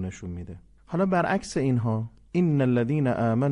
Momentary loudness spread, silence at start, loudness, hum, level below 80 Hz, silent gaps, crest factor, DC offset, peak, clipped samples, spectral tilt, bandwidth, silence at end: 14 LU; 0 s; -25 LUFS; none; -50 dBFS; none; 14 dB; under 0.1%; -12 dBFS; under 0.1%; -7.5 dB/octave; 11 kHz; 0 s